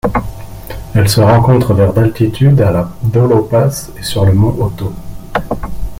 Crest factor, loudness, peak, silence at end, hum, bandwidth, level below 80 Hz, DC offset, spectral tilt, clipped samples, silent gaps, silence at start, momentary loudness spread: 12 dB; -12 LUFS; 0 dBFS; 0 s; none; 16.5 kHz; -28 dBFS; under 0.1%; -7 dB/octave; under 0.1%; none; 0.05 s; 14 LU